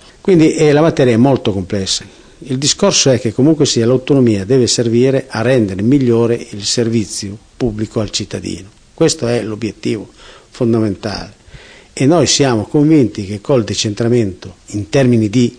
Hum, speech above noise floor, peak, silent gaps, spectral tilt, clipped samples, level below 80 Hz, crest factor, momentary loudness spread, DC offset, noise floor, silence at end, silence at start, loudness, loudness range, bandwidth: none; 25 dB; 0 dBFS; none; -5 dB/octave; under 0.1%; -44 dBFS; 12 dB; 13 LU; under 0.1%; -38 dBFS; 0.05 s; 0.25 s; -13 LUFS; 6 LU; 10.5 kHz